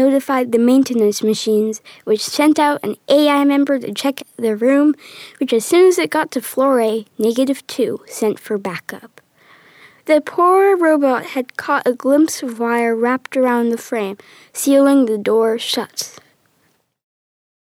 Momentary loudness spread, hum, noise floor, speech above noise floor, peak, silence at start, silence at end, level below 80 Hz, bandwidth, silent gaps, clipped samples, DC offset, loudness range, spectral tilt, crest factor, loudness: 12 LU; none; -62 dBFS; 46 dB; -2 dBFS; 0 s; 1.65 s; -72 dBFS; 19.5 kHz; none; under 0.1%; under 0.1%; 4 LU; -4 dB/octave; 14 dB; -16 LUFS